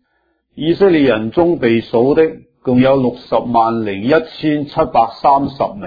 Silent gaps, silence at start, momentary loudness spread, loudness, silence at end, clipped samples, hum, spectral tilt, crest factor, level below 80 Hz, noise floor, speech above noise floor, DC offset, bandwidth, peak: none; 0.55 s; 7 LU; -14 LUFS; 0 s; under 0.1%; none; -9 dB/octave; 14 dB; -44 dBFS; -64 dBFS; 50 dB; under 0.1%; 5 kHz; 0 dBFS